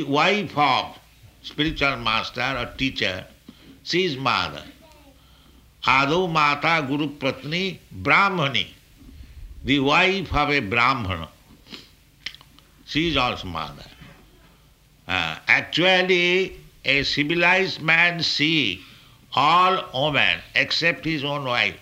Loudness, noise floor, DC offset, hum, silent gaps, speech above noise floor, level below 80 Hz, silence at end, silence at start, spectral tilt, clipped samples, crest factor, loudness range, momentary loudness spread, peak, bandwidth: -21 LUFS; -55 dBFS; under 0.1%; none; none; 33 dB; -46 dBFS; 0.05 s; 0 s; -4.5 dB/octave; under 0.1%; 22 dB; 7 LU; 16 LU; -2 dBFS; 16 kHz